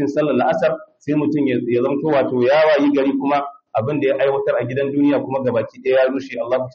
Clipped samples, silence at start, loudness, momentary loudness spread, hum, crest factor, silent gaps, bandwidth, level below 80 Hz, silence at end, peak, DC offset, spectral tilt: under 0.1%; 0 s; -18 LUFS; 7 LU; none; 12 dB; none; 7 kHz; -62 dBFS; 0.05 s; -6 dBFS; under 0.1%; -5.5 dB/octave